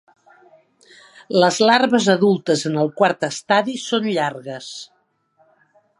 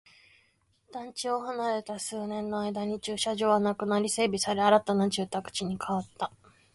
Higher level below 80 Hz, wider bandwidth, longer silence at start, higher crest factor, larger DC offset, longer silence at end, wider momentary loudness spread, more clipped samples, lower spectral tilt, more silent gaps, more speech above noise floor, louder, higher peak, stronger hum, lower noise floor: second, -72 dBFS vs -66 dBFS; about the same, 11.5 kHz vs 11.5 kHz; first, 1.3 s vs 0.9 s; about the same, 20 dB vs 20 dB; neither; first, 1.15 s vs 0.45 s; first, 17 LU vs 12 LU; neither; about the same, -4.5 dB/octave vs -4 dB/octave; neither; about the same, 43 dB vs 40 dB; first, -18 LUFS vs -29 LUFS; first, 0 dBFS vs -10 dBFS; neither; second, -61 dBFS vs -69 dBFS